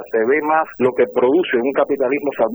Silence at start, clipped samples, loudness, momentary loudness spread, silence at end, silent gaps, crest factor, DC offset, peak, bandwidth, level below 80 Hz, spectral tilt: 0 s; under 0.1%; -17 LUFS; 3 LU; 0 s; none; 14 dB; under 0.1%; -4 dBFS; over 20 kHz; -62 dBFS; -8 dB/octave